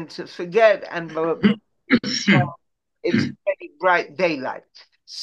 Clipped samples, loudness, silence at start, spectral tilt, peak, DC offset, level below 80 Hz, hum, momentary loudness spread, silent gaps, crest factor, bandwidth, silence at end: under 0.1%; -21 LUFS; 0 s; -5.5 dB/octave; -2 dBFS; under 0.1%; -66 dBFS; none; 13 LU; none; 18 dB; 8.2 kHz; 0 s